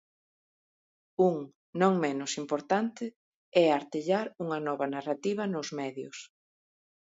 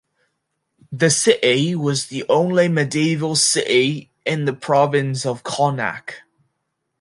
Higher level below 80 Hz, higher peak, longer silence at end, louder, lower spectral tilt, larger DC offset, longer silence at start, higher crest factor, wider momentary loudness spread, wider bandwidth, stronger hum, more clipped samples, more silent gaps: second, -80 dBFS vs -66 dBFS; second, -10 dBFS vs -2 dBFS; about the same, 0.8 s vs 0.85 s; second, -30 LUFS vs -18 LUFS; first, -5.5 dB/octave vs -4 dB/octave; neither; first, 1.2 s vs 0.9 s; about the same, 20 dB vs 18 dB; first, 15 LU vs 9 LU; second, 8 kHz vs 11.5 kHz; neither; neither; first, 1.55-1.73 s, 3.16-3.52 s vs none